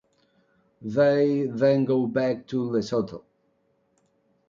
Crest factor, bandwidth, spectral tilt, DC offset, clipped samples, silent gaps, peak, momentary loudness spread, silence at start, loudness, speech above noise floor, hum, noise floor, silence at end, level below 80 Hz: 18 dB; 7.4 kHz; -7.5 dB/octave; under 0.1%; under 0.1%; none; -8 dBFS; 11 LU; 0.8 s; -24 LUFS; 46 dB; none; -69 dBFS; 1.3 s; -66 dBFS